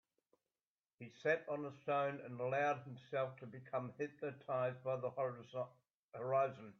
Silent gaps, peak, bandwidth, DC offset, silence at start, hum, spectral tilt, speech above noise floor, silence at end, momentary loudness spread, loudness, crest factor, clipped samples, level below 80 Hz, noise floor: 5.93-6.08 s; -24 dBFS; 6.8 kHz; under 0.1%; 1 s; none; -7 dB/octave; over 49 dB; 0.1 s; 10 LU; -42 LUFS; 20 dB; under 0.1%; -88 dBFS; under -90 dBFS